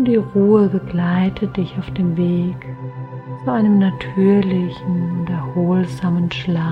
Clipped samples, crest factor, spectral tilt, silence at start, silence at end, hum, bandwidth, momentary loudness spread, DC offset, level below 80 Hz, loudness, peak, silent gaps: under 0.1%; 16 dB; -9 dB/octave; 0 s; 0 s; none; 6 kHz; 11 LU; under 0.1%; -46 dBFS; -18 LUFS; -2 dBFS; none